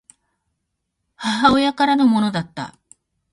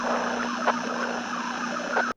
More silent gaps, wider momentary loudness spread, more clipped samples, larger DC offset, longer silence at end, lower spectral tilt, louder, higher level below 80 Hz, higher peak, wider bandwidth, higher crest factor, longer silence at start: neither; first, 16 LU vs 4 LU; neither; neither; first, 0.6 s vs 0.05 s; first, -5 dB/octave vs -3 dB/octave; first, -17 LUFS vs -28 LUFS; first, -52 dBFS vs -66 dBFS; first, -2 dBFS vs -10 dBFS; about the same, 11.5 kHz vs 10.5 kHz; about the same, 20 dB vs 18 dB; first, 1.2 s vs 0 s